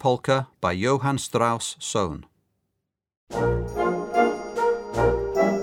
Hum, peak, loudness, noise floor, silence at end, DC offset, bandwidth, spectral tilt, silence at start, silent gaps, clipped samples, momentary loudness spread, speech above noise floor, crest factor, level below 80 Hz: none; -6 dBFS; -24 LUFS; -81 dBFS; 0 s; under 0.1%; 17 kHz; -5 dB/octave; 0 s; 3.17-3.27 s; under 0.1%; 4 LU; 57 dB; 18 dB; -42 dBFS